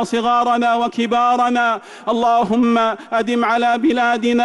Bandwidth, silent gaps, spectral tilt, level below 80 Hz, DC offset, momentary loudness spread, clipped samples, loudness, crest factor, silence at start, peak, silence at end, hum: 11.5 kHz; none; -4.5 dB/octave; -58 dBFS; under 0.1%; 4 LU; under 0.1%; -16 LUFS; 8 dB; 0 s; -8 dBFS; 0 s; none